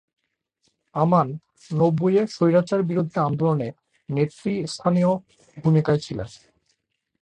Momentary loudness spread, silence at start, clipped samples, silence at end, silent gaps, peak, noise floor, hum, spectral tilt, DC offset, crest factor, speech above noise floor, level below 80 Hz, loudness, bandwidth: 12 LU; 0.95 s; under 0.1%; 0.85 s; none; -6 dBFS; -73 dBFS; none; -8 dB/octave; under 0.1%; 16 dB; 52 dB; -58 dBFS; -23 LUFS; 9.8 kHz